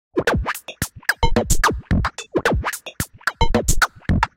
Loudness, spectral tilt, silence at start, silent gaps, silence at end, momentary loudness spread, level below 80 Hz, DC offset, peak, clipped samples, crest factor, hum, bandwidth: -21 LUFS; -4 dB/octave; 0.15 s; none; 0.1 s; 8 LU; -26 dBFS; under 0.1%; 0 dBFS; under 0.1%; 20 dB; none; 17 kHz